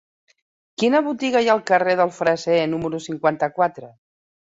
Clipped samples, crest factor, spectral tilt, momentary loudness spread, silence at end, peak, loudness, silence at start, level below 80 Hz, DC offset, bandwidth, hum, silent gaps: under 0.1%; 18 dB; -5 dB/octave; 6 LU; 0.65 s; -4 dBFS; -20 LUFS; 0.8 s; -62 dBFS; under 0.1%; 8 kHz; none; none